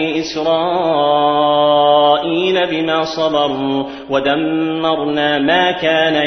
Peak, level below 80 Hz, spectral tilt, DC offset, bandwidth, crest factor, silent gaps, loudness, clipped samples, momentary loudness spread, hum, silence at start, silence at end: 0 dBFS; -54 dBFS; -5 dB/octave; under 0.1%; 6.4 kHz; 14 dB; none; -14 LUFS; under 0.1%; 6 LU; none; 0 s; 0 s